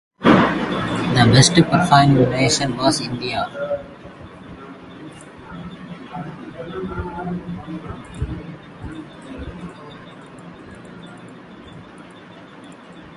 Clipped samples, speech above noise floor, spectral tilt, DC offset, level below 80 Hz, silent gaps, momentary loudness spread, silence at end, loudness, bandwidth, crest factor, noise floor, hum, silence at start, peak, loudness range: under 0.1%; 25 dB; -5 dB/octave; under 0.1%; -42 dBFS; none; 26 LU; 0 s; -17 LUFS; 11.5 kHz; 20 dB; -41 dBFS; none; 0.2 s; 0 dBFS; 22 LU